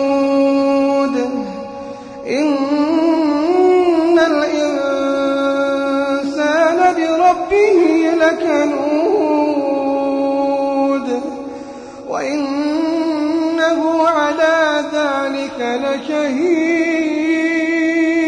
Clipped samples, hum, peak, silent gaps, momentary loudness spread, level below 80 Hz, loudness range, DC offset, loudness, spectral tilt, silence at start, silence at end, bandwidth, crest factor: under 0.1%; none; -2 dBFS; none; 9 LU; -54 dBFS; 4 LU; under 0.1%; -15 LUFS; -4 dB/octave; 0 s; 0 s; 10 kHz; 12 dB